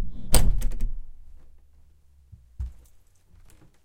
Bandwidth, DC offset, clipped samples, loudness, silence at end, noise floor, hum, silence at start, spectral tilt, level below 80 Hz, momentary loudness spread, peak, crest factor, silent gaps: 16.5 kHz; under 0.1%; under 0.1%; -29 LUFS; 1.15 s; -55 dBFS; none; 0 s; -3.5 dB/octave; -28 dBFS; 24 LU; -2 dBFS; 22 dB; none